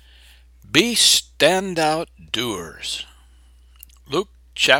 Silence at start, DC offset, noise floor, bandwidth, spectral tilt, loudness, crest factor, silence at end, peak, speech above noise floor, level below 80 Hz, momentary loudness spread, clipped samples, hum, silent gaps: 0.7 s; under 0.1%; -50 dBFS; 17 kHz; -2 dB/octave; -19 LUFS; 22 dB; 0 s; 0 dBFS; 30 dB; -50 dBFS; 15 LU; under 0.1%; none; none